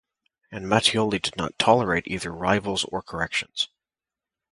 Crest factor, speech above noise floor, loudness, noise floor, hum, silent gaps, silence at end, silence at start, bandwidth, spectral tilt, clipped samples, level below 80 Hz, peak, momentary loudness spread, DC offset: 24 dB; over 66 dB; -24 LUFS; under -90 dBFS; none; none; 0.85 s; 0.5 s; 11.5 kHz; -4 dB/octave; under 0.1%; -52 dBFS; -2 dBFS; 9 LU; under 0.1%